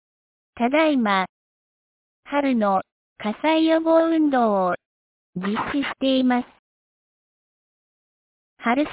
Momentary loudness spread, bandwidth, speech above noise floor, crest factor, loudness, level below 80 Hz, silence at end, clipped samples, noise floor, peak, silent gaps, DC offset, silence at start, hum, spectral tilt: 12 LU; 4 kHz; over 70 dB; 16 dB; -21 LUFS; -62 dBFS; 0 s; under 0.1%; under -90 dBFS; -8 dBFS; 1.29-2.23 s, 2.92-3.16 s, 4.86-5.33 s, 6.59-8.57 s; under 0.1%; 0.55 s; none; -9.5 dB/octave